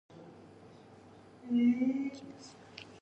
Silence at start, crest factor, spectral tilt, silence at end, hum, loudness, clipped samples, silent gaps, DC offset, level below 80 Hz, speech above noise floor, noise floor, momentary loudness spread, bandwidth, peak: 0.15 s; 16 dB; -6 dB/octave; 0.1 s; none; -32 LUFS; under 0.1%; none; under 0.1%; -76 dBFS; 25 dB; -56 dBFS; 26 LU; 8.2 kHz; -20 dBFS